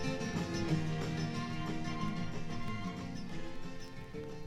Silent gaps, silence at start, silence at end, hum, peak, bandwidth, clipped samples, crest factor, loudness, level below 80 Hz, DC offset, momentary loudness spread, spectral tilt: none; 0 s; 0 s; none; -22 dBFS; 12.5 kHz; under 0.1%; 14 dB; -39 LUFS; -50 dBFS; under 0.1%; 12 LU; -6 dB/octave